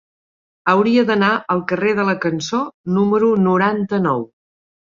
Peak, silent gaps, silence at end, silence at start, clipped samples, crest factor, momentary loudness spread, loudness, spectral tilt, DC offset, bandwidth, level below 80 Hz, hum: -2 dBFS; 2.74-2.84 s; 0.65 s; 0.65 s; under 0.1%; 16 dB; 8 LU; -17 LUFS; -6.5 dB/octave; under 0.1%; 7.4 kHz; -60 dBFS; none